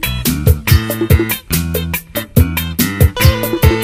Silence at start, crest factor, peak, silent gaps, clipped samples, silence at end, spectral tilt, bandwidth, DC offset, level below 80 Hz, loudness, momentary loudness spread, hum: 0 s; 14 dB; 0 dBFS; none; 0.6%; 0 s; -5 dB/octave; 16 kHz; under 0.1%; -20 dBFS; -14 LUFS; 6 LU; none